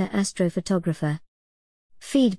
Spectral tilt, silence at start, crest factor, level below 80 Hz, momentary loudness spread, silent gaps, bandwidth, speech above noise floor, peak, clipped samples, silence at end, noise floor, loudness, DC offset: -6 dB/octave; 0 s; 16 dB; -58 dBFS; 9 LU; 1.28-1.90 s; 12 kHz; over 66 dB; -10 dBFS; under 0.1%; 0 s; under -90 dBFS; -25 LUFS; 0.2%